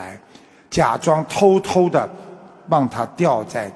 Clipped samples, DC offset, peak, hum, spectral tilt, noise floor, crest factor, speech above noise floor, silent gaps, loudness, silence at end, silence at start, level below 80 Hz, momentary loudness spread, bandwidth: under 0.1%; under 0.1%; -2 dBFS; none; -6 dB/octave; -48 dBFS; 18 dB; 30 dB; none; -18 LUFS; 0 s; 0 s; -52 dBFS; 11 LU; 11 kHz